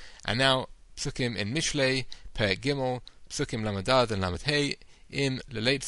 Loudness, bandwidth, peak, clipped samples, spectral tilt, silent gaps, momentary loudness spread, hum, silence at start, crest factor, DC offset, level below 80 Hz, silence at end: -28 LUFS; 11.5 kHz; -8 dBFS; under 0.1%; -4 dB/octave; none; 12 LU; none; 0 s; 22 dB; under 0.1%; -48 dBFS; 0 s